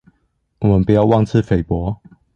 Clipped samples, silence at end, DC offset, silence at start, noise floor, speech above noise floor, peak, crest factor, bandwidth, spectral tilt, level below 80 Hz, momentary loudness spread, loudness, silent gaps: under 0.1%; 0.4 s; under 0.1%; 0.6 s; -65 dBFS; 51 dB; -2 dBFS; 14 dB; 7.2 kHz; -9.5 dB/octave; -34 dBFS; 10 LU; -16 LUFS; none